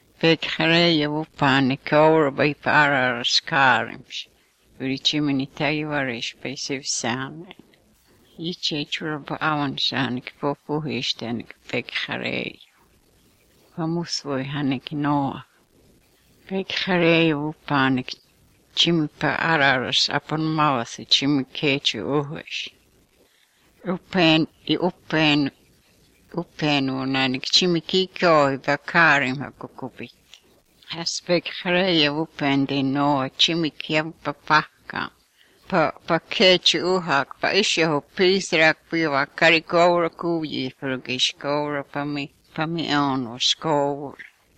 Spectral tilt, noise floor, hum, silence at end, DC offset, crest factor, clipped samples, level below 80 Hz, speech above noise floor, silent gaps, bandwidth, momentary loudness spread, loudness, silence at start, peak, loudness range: -4 dB/octave; -60 dBFS; none; 0.35 s; under 0.1%; 20 dB; under 0.1%; -60 dBFS; 38 dB; none; 9.8 kHz; 13 LU; -21 LUFS; 0.2 s; -4 dBFS; 8 LU